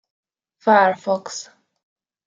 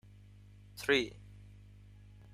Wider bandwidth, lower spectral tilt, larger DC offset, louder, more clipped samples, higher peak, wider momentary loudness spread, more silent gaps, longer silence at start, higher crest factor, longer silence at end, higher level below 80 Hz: second, 9.2 kHz vs 15.5 kHz; about the same, -4 dB/octave vs -4 dB/octave; neither; first, -18 LUFS vs -33 LUFS; neither; first, -2 dBFS vs -16 dBFS; second, 17 LU vs 27 LU; neither; about the same, 0.65 s vs 0.75 s; about the same, 20 dB vs 24 dB; first, 0.85 s vs 0.7 s; second, -76 dBFS vs -60 dBFS